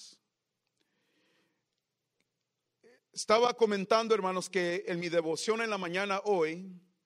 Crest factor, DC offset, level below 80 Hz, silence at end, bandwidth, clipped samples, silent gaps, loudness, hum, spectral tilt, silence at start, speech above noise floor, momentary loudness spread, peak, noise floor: 22 dB; under 0.1%; -82 dBFS; 0.25 s; 13 kHz; under 0.1%; none; -30 LUFS; none; -4 dB/octave; 0 s; 55 dB; 9 LU; -12 dBFS; -85 dBFS